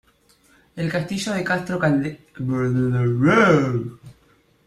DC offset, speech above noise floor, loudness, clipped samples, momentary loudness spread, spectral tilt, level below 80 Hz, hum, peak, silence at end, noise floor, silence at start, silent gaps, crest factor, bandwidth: under 0.1%; 38 dB; -21 LUFS; under 0.1%; 14 LU; -6.5 dB/octave; -54 dBFS; none; -2 dBFS; 0.55 s; -58 dBFS; 0.75 s; none; 18 dB; 13 kHz